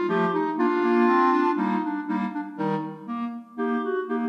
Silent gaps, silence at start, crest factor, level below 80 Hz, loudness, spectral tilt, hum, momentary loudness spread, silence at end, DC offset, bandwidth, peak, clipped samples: none; 0 s; 14 dB; -82 dBFS; -25 LUFS; -8 dB/octave; none; 12 LU; 0 s; under 0.1%; 6.4 kHz; -10 dBFS; under 0.1%